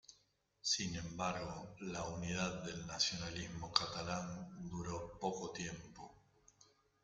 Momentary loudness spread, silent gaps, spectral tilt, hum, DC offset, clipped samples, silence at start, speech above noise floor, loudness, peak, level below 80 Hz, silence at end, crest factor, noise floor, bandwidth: 11 LU; none; -3 dB/octave; none; under 0.1%; under 0.1%; 0.1 s; 34 dB; -41 LUFS; -14 dBFS; -64 dBFS; 0.4 s; 30 dB; -76 dBFS; 9.4 kHz